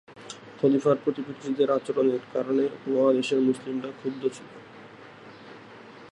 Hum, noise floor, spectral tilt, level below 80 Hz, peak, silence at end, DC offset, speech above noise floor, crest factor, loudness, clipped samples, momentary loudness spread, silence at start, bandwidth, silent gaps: none; -47 dBFS; -6.5 dB/octave; -74 dBFS; -8 dBFS; 0.05 s; under 0.1%; 22 dB; 18 dB; -26 LUFS; under 0.1%; 23 LU; 0.1 s; 11 kHz; none